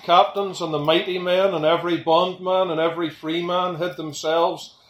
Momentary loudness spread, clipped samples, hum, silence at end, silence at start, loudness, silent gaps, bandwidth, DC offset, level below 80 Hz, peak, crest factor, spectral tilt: 7 LU; under 0.1%; none; 0.2 s; 0 s; -21 LUFS; none; 16 kHz; under 0.1%; -68 dBFS; -2 dBFS; 18 dB; -5 dB/octave